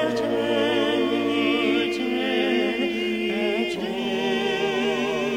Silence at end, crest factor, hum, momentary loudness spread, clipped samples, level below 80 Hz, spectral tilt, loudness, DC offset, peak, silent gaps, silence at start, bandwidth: 0 s; 12 dB; none; 3 LU; under 0.1%; -56 dBFS; -4.5 dB/octave; -23 LUFS; under 0.1%; -10 dBFS; none; 0 s; 16.5 kHz